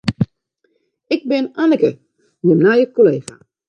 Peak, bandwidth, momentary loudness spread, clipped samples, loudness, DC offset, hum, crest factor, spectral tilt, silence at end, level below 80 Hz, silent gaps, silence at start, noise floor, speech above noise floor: 0 dBFS; 10.5 kHz; 11 LU; under 0.1%; -16 LUFS; under 0.1%; none; 16 dB; -7.5 dB/octave; 0.5 s; -50 dBFS; none; 0.05 s; -65 dBFS; 51 dB